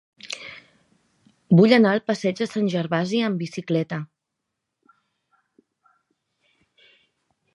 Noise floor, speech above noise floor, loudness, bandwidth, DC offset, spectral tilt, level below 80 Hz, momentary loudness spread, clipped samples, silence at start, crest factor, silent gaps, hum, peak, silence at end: -81 dBFS; 61 dB; -21 LUFS; 11.5 kHz; under 0.1%; -6.5 dB/octave; -72 dBFS; 19 LU; under 0.1%; 0.25 s; 22 dB; none; none; -2 dBFS; 3.5 s